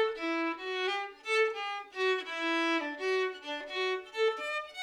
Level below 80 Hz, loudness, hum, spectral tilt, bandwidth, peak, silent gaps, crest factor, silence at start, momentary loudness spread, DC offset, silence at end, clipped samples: -76 dBFS; -32 LUFS; none; -1 dB/octave; 12 kHz; -18 dBFS; none; 14 dB; 0 s; 7 LU; under 0.1%; 0 s; under 0.1%